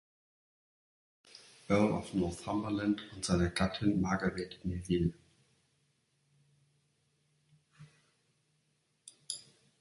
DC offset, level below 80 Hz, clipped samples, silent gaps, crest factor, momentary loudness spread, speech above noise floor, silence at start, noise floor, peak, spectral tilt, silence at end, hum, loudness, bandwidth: under 0.1%; -54 dBFS; under 0.1%; none; 22 dB; 12 LU; 44 dB; 1.35 s; -77 dBFS; -16 dBFS; -6 dB/octave; 0.4 s; none; -34 LUFS; 11.5 kHz